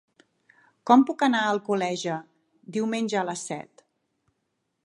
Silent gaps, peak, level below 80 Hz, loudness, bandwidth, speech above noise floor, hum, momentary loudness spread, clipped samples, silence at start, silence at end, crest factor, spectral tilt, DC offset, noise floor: none; -4 dBFS; -80 dBFS; -25 LUFS; 11.5 kHz; 54 dB; none; 16 LU; under 0.1%; 0.85 s; 1.2 s; 24 dB; -4.5 dB/octave; under 0.1%; -78 dBFS